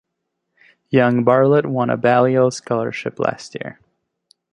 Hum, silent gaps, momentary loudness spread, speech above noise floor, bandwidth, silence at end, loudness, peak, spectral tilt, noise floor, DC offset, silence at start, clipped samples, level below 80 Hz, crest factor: none; none; 16 LU; 60 dB; 10.5 kHz; 0.8 s; -17 LUFS; -2 dBFS; -6.5 dB/octave; -76 dBFS; under 0.1%; 0.9 s; under 0.1%; -62 dBFS; 16 dB